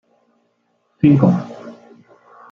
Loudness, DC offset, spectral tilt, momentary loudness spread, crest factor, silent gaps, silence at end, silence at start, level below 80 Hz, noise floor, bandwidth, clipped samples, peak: -15 LUFS; under 0.1%; -10.5 dB/octave; 24 LU; 18 dB; none; 0.8 s; 1.05 s; -56 dBFS; -65 dBFS; 6.6 kHz; under 0.1%; -2 dBFS